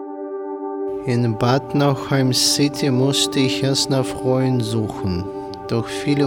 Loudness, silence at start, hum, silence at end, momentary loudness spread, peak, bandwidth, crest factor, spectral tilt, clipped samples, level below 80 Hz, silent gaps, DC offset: -19 LUFS; 0 s; none; 0 s; 12 LU; -4 dBFS; 17.5 kHz; 16 dB; -5 dB/octave; under 0.1%; -52 dBFS; none; under 0.1%